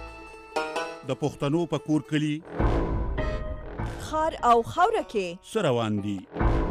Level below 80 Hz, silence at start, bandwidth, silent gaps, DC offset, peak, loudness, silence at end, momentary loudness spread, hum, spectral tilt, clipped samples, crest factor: -34 dBFS; 0 s; 13.5 kHz; none; under 0.1%; -10 dBFS; -27 LUFS; 0 s; 12 LU; none; -6.5 dB/octave; under 0.1%; 16 dB